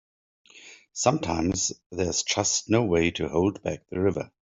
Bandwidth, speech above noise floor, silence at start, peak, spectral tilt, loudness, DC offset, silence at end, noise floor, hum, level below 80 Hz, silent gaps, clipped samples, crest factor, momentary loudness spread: 8.2 kHz; 25 dB; 0.55 s; -6 dBFS; -4 dB/octave; -26 LUFS; under 0.1%; 0.3 s; -51 dBFS; none; -54 dBFS; 1.86-1.90 s; under 0.1%; 22 dB; 8 LU